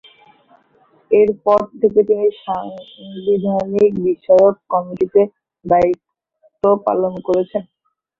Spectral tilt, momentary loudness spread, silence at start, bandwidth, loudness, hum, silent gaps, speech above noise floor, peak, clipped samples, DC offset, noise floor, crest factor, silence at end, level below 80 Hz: -8.5 dB/octave; 11 LU; 1.1 s; 6.8 kHz; -16 LUFS; none; none; 43 dB; -2 dBFS; under 0.1%; under 0.1%; -58 dBFS; 16 dB; 0.6 s; -54 dBFS